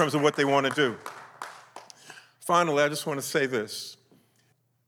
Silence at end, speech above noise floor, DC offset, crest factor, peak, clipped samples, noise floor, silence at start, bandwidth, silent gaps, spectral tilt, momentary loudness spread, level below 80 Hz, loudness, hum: 0.95 s; 43 dB; under 0.1%; 20 dB; -8 dBFS; under 0.1%; -68 dBFS; 0 s; 18 kHz; none; -4 dB/octave; 23 LU; -80 dBFS; -26 LUFS; none